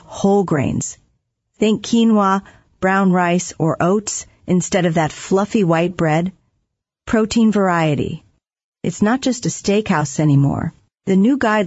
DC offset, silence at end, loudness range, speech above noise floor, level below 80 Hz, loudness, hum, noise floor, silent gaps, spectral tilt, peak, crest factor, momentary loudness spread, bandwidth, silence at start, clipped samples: under 0.1%; 0 s; 2 LU; 57 dB; -48 dBFS; -17 LUFS; none; -73 dBFS; 8.64-8.72 s; -6 dB/octave; -4 dBFS; 14 dB; 10 LU; 8 kHz; 0.1 s; under 0.1%